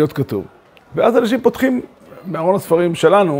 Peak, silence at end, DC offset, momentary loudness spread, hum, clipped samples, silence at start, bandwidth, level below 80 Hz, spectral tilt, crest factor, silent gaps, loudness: 0 dBFS; 0 s; under 0.1%; 14 LU; none; under 0.1%; 0 s; 16.5 kHz; -54 dBFS; -6.5 dB/octave; 16 dB; none; -16 LUFS